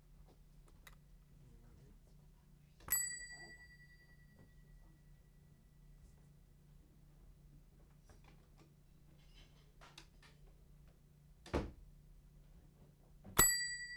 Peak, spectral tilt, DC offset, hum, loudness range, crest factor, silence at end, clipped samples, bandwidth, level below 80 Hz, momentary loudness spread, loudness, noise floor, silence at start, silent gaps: -14 dBFS; -1.5 dB/octave; under 0.1%; none; 21 LU; 34 dB; 0 s; under 0.1%; over 20 kHz; -60 dBFS; 33 LU; -36 LUFS; -65 dBFS; 0.1 s; none